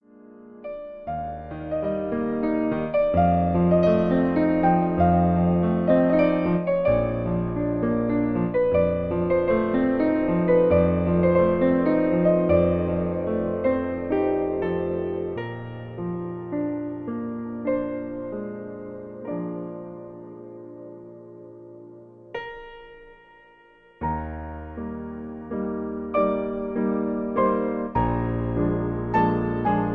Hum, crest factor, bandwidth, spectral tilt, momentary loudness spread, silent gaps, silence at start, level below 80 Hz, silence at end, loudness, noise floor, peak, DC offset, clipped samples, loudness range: none; 16 dB; 4.8 kHz; -11 dB/octave; 17 LU; none; 0.25 s; -42 dBFS; 0 s; -23 LUFS; -54 dBFS; -8 dBFS; under 0.1%; under 0.1%; 16 LU